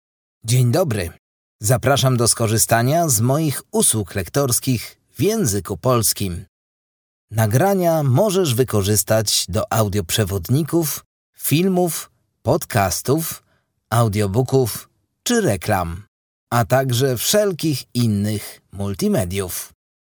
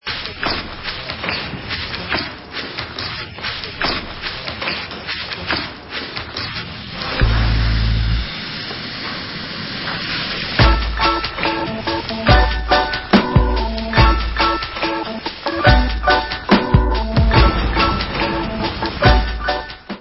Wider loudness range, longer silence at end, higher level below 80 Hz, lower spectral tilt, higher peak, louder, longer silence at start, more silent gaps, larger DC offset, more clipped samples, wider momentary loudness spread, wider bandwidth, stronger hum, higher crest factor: second, 3 LU vs 7 LU; first, 0.5 s vs 0 s; second, -46 dBFS vs -22 dBFS; second, -4.5 dB/octave vs -8.5 dB/octave; about the same, 0 dBFS vs 0 dBFS; about the same, -19 LUFS vs -19 LUFS; first, 0.45 s vs 0.05 s; first, 1.19-1.59 s, 6.48-7.28 s, 11.06-11.33 s, 16.08-16.47 s vs none; neither; neither; about the same, 11 LU vs 11 LU; first, over 20 kHz vs 5.8 kHz; neither; about the same, 18 dB vs 18 dB